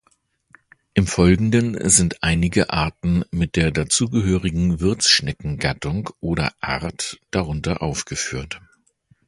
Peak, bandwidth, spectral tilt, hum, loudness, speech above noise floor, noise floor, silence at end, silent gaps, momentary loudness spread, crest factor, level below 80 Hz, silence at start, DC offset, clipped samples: 0 dBFS; 11.5 kHz; -4 dB/octave; none; -20 LUFS; 44 dB; -64 dBFS; 0.7 s; none; 11 LU; 20 dB; -36 dBFS; 0.95 s; under 0.1%; under 0.1%